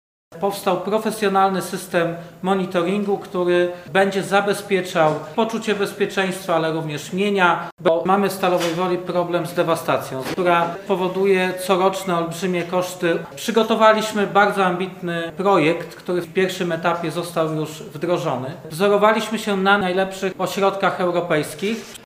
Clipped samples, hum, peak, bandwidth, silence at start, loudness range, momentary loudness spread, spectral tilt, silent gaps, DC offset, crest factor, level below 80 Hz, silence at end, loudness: under 0.1%; none; 0 dBFS; 16 kHz; 0.3 s; 2 LU; 8 LU; -5 dB/octave; 7.72-7.77 s; under 0.1%; 20 dB; -62 dBFS; 0 s; -20 LUFS